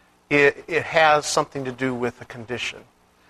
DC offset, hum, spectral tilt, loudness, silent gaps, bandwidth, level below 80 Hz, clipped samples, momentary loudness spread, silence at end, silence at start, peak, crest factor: under 0.1%; none; -3.5 dB/octave; -21 LUFS; none; 13.5 kHz; -58 dBFS; under 0.1%; 13 LU; 0.5 s; 0.3 s; -2 dBFS; 22 dB